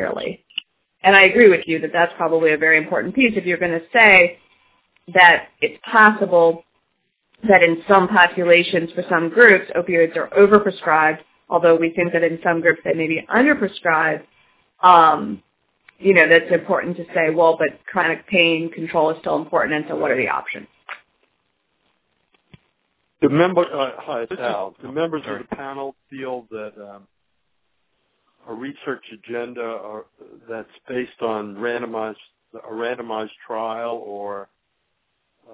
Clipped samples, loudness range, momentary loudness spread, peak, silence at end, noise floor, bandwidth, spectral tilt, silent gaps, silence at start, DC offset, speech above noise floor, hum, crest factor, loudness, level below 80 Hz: under 0.1%; 16 LU; 20 LU; 0 dBFS; 1.1 s; -73 dBFS; 4 kHz; -8 dB/octave; none; 0 s; under 0.1%; 56 dB; none; 18 dB; -16 LUFS; -60 dBFS